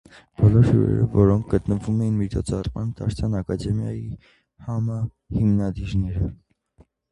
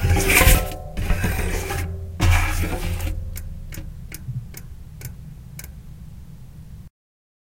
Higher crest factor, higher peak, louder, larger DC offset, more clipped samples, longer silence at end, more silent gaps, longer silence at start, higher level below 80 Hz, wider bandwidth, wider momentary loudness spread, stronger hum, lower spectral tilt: about the same, 18 dB vs 22 dB; second, -4 dBFS vs 0 dBFS; about the same, -23 LUFS vs -22 LUFS; neither; neither; first, 0.75 s vs 0.55 s; neither; first, 0.4 s vs 0 s; second, -36 dBFS vs -26 dBFS; second, 10.5 kHz vs 17 kHz; second, 12 LU vs 25 LU; neither; first, -9 dB/octave vs -4 dB/octave